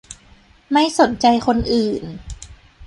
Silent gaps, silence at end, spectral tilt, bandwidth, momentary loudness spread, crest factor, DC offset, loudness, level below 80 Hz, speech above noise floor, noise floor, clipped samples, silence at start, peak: none; 0 s; -4.5 dB/octave; 11.5 kHz; 20 LU; 18 dB; under 0.1%; -17 LUFS; -40 dBFS; 33 dB; -50 dBFS; under 0.1%; 0.1 s; -2 dBFS